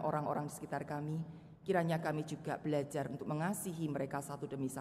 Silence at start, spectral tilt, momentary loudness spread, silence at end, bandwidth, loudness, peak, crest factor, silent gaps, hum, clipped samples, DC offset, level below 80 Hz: 0 s; -6.5 dB/octave; 7 LU; 0 s; 15.5 kHz; -39 LUFS; -20 dBFS; 18 dB; none; none; under 0.1%; under 0.1%; -72 dBFS